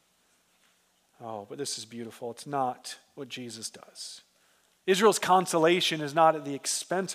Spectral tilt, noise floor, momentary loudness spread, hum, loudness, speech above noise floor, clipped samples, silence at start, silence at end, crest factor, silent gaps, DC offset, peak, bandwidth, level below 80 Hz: -3 dB/octave; -68 dBFS; 19 LU; none; -27 LUFS; 40 dB; under 0.1%; 1.2 s; 0 s; 22 dB; none; under 0.1%; -8 dBFS; 16 kHz; -86 dBFS